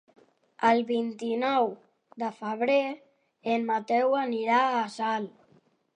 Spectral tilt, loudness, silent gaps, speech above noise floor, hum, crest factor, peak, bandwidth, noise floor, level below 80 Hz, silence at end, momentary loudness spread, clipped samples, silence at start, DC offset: -5 dB/octave; -27 LUFS; none; 37 dB; none; 18 dB; -10 dBFS; 10 kHz; -64 dBFS; -84 dBFS; 0.65 s; 11 LU; under 0.1%; 0.6 s; under 0.1%